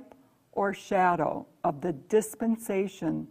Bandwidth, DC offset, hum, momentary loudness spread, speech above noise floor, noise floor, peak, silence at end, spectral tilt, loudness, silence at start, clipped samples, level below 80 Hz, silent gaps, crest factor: 15.5 kHz; under 0.1%; none; 7 LU; 29 dB; -57 dBFS; -10 dBFS; 0.05 s; -6 dB/octave; -29 LUFS; 0 s; under 0.1%; -64 dBFS; none; 18 dB